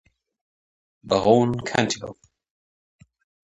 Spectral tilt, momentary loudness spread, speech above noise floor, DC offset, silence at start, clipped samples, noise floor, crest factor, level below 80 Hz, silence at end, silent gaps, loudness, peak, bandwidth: -5 dB/octave; 12 LU; over 69 dB; under 0.1%; 1.05 s; under 0.1%; under -90 dBFS; 24 dB; -56 dBFS; 1.3 s; none; -21 LUFS; 0 dBFS; 8.2 kHz